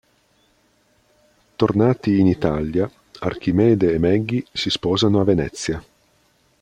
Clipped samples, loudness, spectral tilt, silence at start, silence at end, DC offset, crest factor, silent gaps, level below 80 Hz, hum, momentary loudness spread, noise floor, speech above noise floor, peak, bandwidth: under 0.1%; -20 LUFS; -6.5 dB/octave; 1.6 s; 0.8 s; under 0.1%; 18 dB; none; -46 dBFS; none; 11 LU; -61 dBFS; 43 dB; -2 dBFS; 10.5 kHz